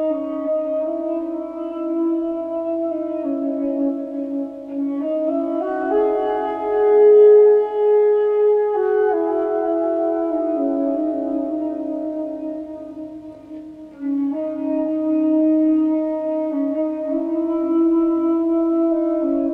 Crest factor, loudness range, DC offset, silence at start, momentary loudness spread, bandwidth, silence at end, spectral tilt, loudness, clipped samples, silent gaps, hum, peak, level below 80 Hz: 14 dB; 10 LU; under 0.1%; 0 s; 11 LU; 3.6 kHz; 0 s; -8 dB/octave; -19 LUFS; under 0.1%; none; none; -4 dBFS; -58 dBFS